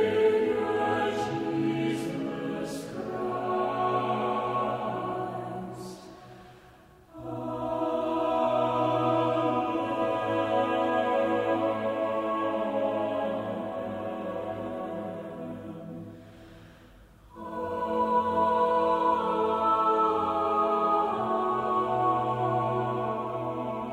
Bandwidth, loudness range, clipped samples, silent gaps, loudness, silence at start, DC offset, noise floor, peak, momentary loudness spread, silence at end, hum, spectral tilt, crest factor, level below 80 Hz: 15.5 kHz; 10 LU; under 0.1%; none; -28 LUFS; 0 s; under 0.1%; -54 dBFS; -14 dBFS; 13 LU; 0 s; none; -6.5 dB/octave; 16 dB; -62 dBFS